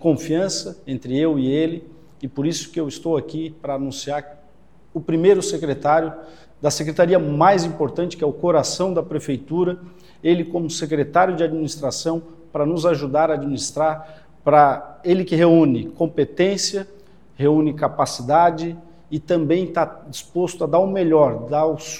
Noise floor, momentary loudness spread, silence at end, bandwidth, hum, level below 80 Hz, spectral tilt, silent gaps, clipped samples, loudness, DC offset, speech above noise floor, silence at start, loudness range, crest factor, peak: -53 dBFS; 13 LU; 0 s; 15 kHz; none; -54 dBFS; -5.5 dB/octave; none; under 0.1%; -20 LUFS; 0.4%; 34 dB; 0 s; 5 LU; 20 dB; 0 dBFS